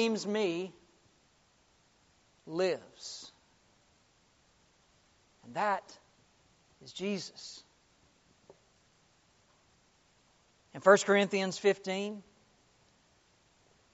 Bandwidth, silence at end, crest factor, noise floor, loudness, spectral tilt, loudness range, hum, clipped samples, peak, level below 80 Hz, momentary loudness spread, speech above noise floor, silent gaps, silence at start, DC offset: 8 kHz; 1.7 s; 28 dB; -68 dBFS; -32 LUFS; -3 dB/octave; 14 LU; none; under 0.1%; -8 dBFS; -78 dBFS; 24 LU; 37 dB; none; 0 s; under 0.1%